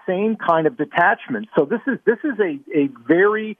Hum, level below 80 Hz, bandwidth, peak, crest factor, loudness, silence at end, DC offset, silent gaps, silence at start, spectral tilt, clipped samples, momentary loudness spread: none; -70 dBFS; 3.7 kHz; -4 dBFS; 16 dB; -19 LUFS; 0.05 s; under 0.1%; none; 0.05 s; -8.5 dB/octave; under 0.1%; 5 LU